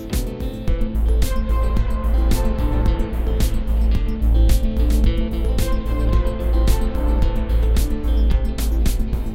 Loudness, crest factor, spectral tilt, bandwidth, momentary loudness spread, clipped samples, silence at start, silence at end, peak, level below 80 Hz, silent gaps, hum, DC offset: -21 LUFS; 14 dB; -6.5 dB/octave; 15.5 kHz; 4 LU; under 0.1%; 0 s; 0 s; -4 dBFS; -18 dBFS; none; none; under 0.1%